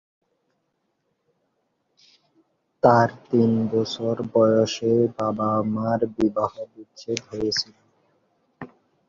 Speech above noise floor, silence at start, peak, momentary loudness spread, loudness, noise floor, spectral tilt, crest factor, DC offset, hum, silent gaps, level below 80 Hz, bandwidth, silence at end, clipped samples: 52 dB; 2.85 s; -2 dBFS; 21 LU; -22 LUFS; -74 dBFS; -6 dB/octave; 22 dB; under 0.1%; none; none; -60 dBFS; 7.4 kHz; 0.45 s; under 0.1%